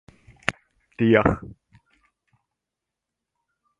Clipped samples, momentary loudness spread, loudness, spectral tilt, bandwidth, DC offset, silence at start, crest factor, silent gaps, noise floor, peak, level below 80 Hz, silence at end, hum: under 0.1%; 14 LU; -22 LUFS; -7 dB/octave; 11 kHz; under 0.1%; 0.5 s; 26 dB; none; -85 dBFS; 0 dBFS; -46 dBFS; 2.35 s; none